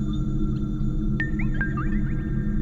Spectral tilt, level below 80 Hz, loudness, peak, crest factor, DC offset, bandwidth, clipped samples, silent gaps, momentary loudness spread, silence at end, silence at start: -9 dB/octave; -28 dBFS; -27 LUFS; -12 dBFS; 12 dB; under 0.1%; 7.2 kHz; under 0.1%; none; 2 LU; 0 s; 0 s